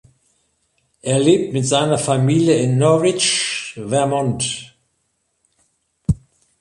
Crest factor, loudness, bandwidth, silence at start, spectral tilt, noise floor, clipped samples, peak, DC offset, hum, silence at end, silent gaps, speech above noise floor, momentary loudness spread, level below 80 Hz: 16 dB; -17 LUFS; 11.5 kHz; 1.05 s; -4.5 dB/octave; -69 dBFS; under 0.1%; -2 dBFS; under 0.1%; none; 0.45 s; none; 53 dB; 10 LU; -42 dBFS